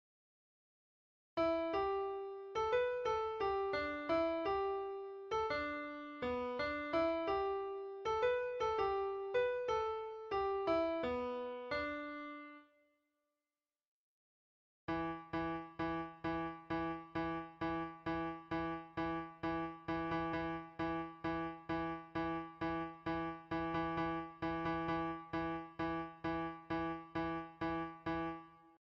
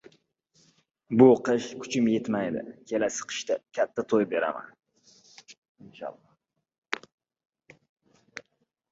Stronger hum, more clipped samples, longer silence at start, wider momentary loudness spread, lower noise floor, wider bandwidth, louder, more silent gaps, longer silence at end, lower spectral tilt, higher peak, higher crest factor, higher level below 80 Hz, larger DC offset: neither; neither; first, 1.35 s vs 1.1 s; second, 7 LU vs 22 LU; first, under -90 dBFS vs -75 dBFS; second, 7 kHz vs 8 kHz; second, -40 LUFS vs -26 LUFS; first, 13.87-14.88 s vs 5.58-5.62 s, 5.69-5.75 s, 6.78-6.82 s, 7.14-7.18 s, 7.45-7.50 s, 7.89-7.96 s; second, 0.25 s vs 0.5 s; first, -7 dB/octave vs -5 dB/octave; second, -24 dBFS vs -6 dBFS; second, 16 dB vs 24 dB; first, -62 dBFS vs -72 dBFS; neither